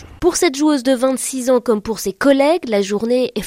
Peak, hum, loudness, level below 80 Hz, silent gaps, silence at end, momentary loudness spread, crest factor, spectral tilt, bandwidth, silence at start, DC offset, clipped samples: 0 dBFS; none; -16 LUFS; -46 dBFS; none; 0 s; 5 LU; 16 dB; -3.5 dB/octave; 16.5 kHz; 0 s; under 0.1%; under 0.1%